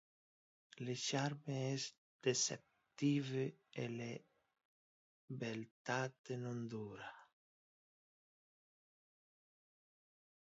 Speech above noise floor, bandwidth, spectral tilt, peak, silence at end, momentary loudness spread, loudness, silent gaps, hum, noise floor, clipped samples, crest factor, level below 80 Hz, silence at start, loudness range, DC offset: over 48 dB; 7.6 kHz; -4.5 dB/octave; -24 dBFS; 3.3 s; 13 LU; -43 LUFS; 1.98-2.19 s, 4.65-5.28 s, 5.71-5.85 s, 6.19-6.24 s; none; under -90 dBFS; under 0.1%; 22 dB; -86 dBFS; 0.75 s; 11 LU; under 0.1%